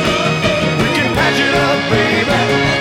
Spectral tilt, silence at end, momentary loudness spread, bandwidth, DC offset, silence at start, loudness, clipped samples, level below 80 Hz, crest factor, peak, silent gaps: -4.5 dB/octave; 0 s; 2 LU; 16.5 kHz; under 0.1%; 0 s; -13 LUFS; under 0.1%; -36 dBFS; 12 dB; -2 dBFS; none